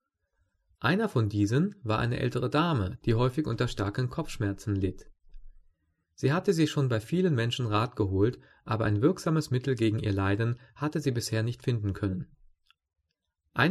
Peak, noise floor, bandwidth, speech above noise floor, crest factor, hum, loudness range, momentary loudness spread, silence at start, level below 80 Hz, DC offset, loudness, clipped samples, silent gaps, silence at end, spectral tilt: -10 dBFS; -81 dBFS; 13 kHz; 53 dB; 20 dB; none; 4 LU; 7 LU; 0.8 s; -52 dBFS; under 0.1%; -29 LUFS; under 0.1%; none; 0 s; -6.5 dB/octave